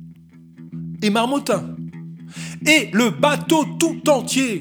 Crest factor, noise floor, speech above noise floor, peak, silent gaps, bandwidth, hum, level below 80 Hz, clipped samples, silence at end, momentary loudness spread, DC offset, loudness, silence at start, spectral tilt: 20 dB; -44 dBFS; 26 dB; 0 dBFS; none; over 20 kHz; none; -62 dBFS; under 0.1%; 0 s; 19 LU; under 0.1%; -18 LUFS; 0 s; -4 dB/octave